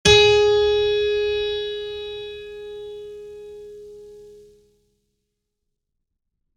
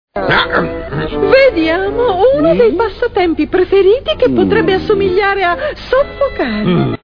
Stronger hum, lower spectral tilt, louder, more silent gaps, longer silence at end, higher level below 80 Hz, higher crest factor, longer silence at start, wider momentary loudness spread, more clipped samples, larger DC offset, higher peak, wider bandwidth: neither; second, -3 dB/octave vs -8 dB/octave; second, -19 LUFS vs -12 LUFS; neither; first, 2.3 s vs 0.1 s; second, -44 dBFS vs -32 dBFS; first, 22 dB vs 12 dB; about the same, 0.05 s vs 0.15 s; first, 25 LU vs 6 LU; neither; neither; about the same, -2 dBFS vs 0 dBFS; first, 11 kHz vs 5.4 kHz